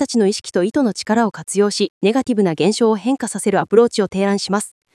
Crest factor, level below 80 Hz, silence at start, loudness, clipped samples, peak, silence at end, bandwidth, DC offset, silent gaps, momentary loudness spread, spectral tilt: 16 dB; -60 dBFS; 0 s; -17 LUFS; under 0.1%; 0 dBFS; 0.25 s; 12 kHz; under 0.1%; 1.90-2.01 s; 5 LU; -5 dB/octave